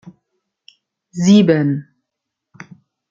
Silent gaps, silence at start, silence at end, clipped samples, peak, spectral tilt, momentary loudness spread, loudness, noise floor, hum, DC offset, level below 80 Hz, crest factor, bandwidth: none; 1.15 s; 1.3 s; under 0.1%; -2 dBFS; -6.5 dB/octave; 15 LU; -14 LUFS; -80 dBFS; none; under 0.1%; -62 dBFS; 18 dB; 7.6 kHz